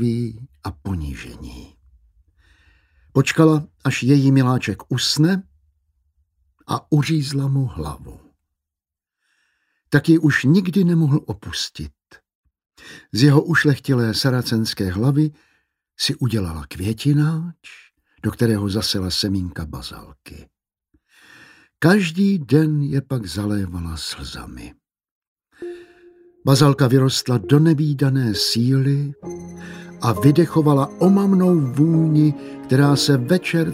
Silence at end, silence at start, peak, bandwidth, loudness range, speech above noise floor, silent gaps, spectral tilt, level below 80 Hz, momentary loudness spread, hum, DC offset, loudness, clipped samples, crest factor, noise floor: 0 s; 0 s; 0 dBFS; 16 kHz; 8 LU; 69 dB; 12.35-12.44 s, 25.11-25.36 s; -6 dB/octave; -46 dBFS; 18 LU; none; under 0.1%; -18 LUFS; under 0.1%; 18 dB; -87 dBFS